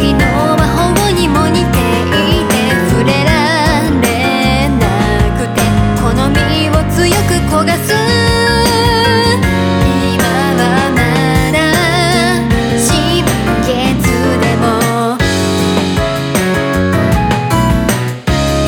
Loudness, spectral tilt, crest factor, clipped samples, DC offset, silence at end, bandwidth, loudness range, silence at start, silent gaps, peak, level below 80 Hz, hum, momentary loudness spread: -11 LUFS; -5 dB/octave; 10 dB; under 0.1%; under 0.1%; 0 s; 20 kHz; 2 LU; 0 s; none; 0 dBFS; -22 dBFS; none; 3 LU